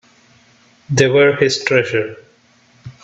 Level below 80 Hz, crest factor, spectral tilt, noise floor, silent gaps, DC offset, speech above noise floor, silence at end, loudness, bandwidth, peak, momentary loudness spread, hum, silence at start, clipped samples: -54 dBFS; 18 dB; -4.5 dB/octave; -53 dBFS; none; under 0.1%; 38 dB; 0.15 s; -14 LUFS; 8.4 kHz; 0 dBFS; 9 LU; none; 0.9 s; under 0.1%